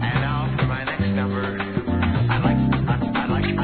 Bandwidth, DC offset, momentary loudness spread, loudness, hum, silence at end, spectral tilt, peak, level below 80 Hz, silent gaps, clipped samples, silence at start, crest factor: 4.5 kHz; 0.3%; 5 LU; -22 LUFS; none; 0 s; -11 dB/octave; -6 dBFS; -36 dBFS; none; under 0.1%; 0 s; 14 dB